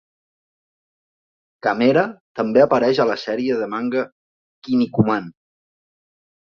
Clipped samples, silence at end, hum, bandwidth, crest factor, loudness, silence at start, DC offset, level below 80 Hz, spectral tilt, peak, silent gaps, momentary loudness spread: under 0.1%; 1.2 s; none; 6.8 kHz; 20 dB; -19 LUFS; 1.65 s; under 0.1%; -60 dBFS; -7.5 dB/octave; -2 dBFS; 2.20-2.35 s, 4.12-4.62 s; 10 LU